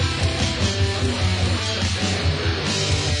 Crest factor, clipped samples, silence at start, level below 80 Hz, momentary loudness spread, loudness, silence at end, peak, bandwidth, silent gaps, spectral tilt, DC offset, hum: 14 dB; under 0.1%; 0 s; -36 dBFS; 1 LU; -21 LUFS; 0 s; -6 dBFS; 11 kHz; none; -4 dB/octave; under 0.1%; none